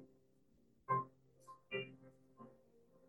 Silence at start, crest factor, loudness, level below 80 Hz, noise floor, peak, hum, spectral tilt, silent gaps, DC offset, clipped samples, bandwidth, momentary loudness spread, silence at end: 0 s; 22 dB; -44 LUFS; -86 dBFS; -74 dBFS; -26 dBFS; none; -6.5 dB/octave; none; under 0.1%; under 0.1%; 17.5 kHz; 23 LU; 0.55 s